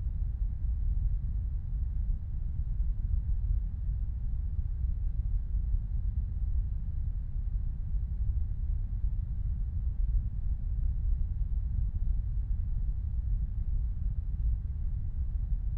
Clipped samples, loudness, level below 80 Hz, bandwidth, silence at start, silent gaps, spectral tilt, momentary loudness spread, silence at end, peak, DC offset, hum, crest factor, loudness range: under 0.1%; -35 LUFS; -30 dBFS; 1.2 kHz; 0 s; none; -11.5 dB/octave; 3 LU; 0 s; -18 dBFS; under 0.1%; none; 12 dB; 1 LU